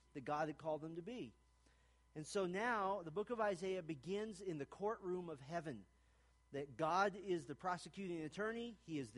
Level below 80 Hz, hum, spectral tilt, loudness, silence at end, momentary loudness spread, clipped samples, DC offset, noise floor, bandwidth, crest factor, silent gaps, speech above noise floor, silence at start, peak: -74 dBFS; none; -5.5 dB/octave; -44 LUFS; 0 s; 11 LU; under 0.1%; under 0.1%; -73 dBFS; 11.5 kHz; 22 dB; none; 29 dB; 0.15 s; -24 dBFS